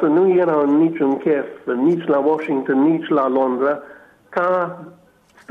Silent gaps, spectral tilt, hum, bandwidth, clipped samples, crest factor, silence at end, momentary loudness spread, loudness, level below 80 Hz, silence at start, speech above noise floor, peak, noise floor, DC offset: none; -9 dB/octave; none; 4.6 kHz; under 0.1%; 12 dB; 0.6 s; 8 LU; -18 LUFS; -68 dBFS; 0 s; 29 dB; -6 dBFS; -46 dBFS; under 0.1%